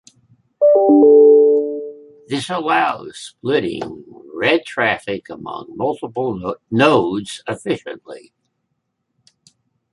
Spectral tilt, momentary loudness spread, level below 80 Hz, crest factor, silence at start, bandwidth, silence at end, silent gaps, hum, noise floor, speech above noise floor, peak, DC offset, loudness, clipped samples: -5.5 dB/octave; 20 LU; -58 dBFS; 16 dB; 0.6 s; 11.5 kHz; 1.75 s; none; none; -72 dBFS; 52 dB; 0 dBFS; under 0.1%; -16 LUFS; under 0.1%